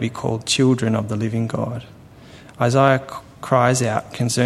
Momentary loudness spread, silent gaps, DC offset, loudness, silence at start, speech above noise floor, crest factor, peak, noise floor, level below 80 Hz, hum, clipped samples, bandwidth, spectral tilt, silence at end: 11 LU; none; under 0.1%; -19 LUFS; 0 s; 24 dB; 18 dB; 0 dBFS; -43 dBFS; -54 dBFS; none; under 0.1%; 13.5 kHz; -5 dB/octave; 0 s